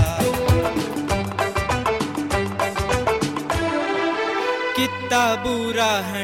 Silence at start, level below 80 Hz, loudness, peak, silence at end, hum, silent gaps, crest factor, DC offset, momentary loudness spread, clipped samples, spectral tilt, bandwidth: 0 s; -36 dBFS; -22 LUFS; -6 dBFS; 0 s; none; none; 16 dB; under 0.1%; 4 LU; under 0.1%; -4.5 dB/octave; 16.5 kHz